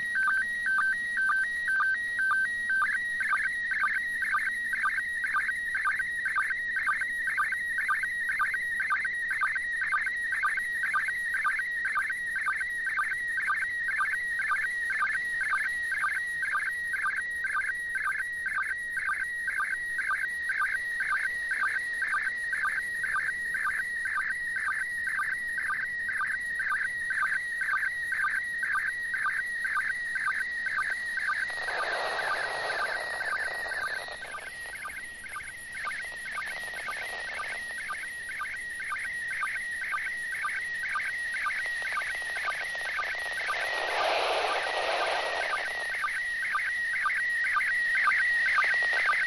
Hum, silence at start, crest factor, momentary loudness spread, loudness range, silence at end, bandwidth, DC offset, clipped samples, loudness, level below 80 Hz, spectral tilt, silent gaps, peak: none; 0 s; 14 dB; 7 LU; 6 LU; 0 s; 12.5 kHz; under 0.1%; under 0.1%; -29 LUFS; -62 dBFS; -0.5 dB/octave; none; -16 dBFS